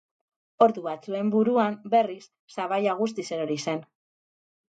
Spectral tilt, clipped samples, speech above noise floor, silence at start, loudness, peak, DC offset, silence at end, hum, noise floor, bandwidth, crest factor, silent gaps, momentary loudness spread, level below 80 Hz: -5.5 dB/octave; under 0.1%; over 65 dB; 0.6 s; -26 LUFS; -6 dBFS; under 0.1%; 0.85 s; none; under -90 dBFS; 9 kHz; 20 dB; 2.39-2.48 s; 11 LU; -80 dBFS